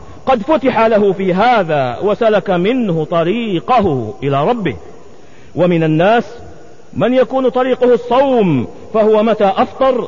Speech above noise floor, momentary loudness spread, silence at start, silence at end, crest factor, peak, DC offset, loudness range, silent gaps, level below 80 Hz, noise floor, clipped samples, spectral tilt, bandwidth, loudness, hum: 28 dB; 7 LU; 0 s; 0 s; 10 dB; -2 dBFS; 2%; 3 LU; none; -46 dBFS; -41 dBFS; under 0.1%; -8 dB/octave; 7.4 kHz; -13 LUFS; none